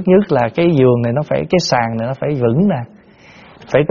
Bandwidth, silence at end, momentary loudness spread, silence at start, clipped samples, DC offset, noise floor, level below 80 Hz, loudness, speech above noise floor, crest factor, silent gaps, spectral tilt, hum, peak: 7.2 kHz; 0 s; 7 LU; 0 s; under 0.1%; under 0.1%; -43 dBFS; -46 dBFS; -15 LUFS; 29 dB; 14 dB; none; -6 dB/octave; none; 0 dBFS